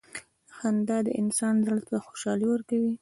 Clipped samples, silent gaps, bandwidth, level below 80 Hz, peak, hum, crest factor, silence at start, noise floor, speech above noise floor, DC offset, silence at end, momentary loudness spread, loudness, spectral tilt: under 0.1%; none; 11.5 kHz; -72 dBFS; -14 dBFS; none; 14 dB; 0.15 s; -46 dBFS; 19 dB; under 0.1%; 0.05 s; 8 LU; -28 LUFS; -5.5 dB/octave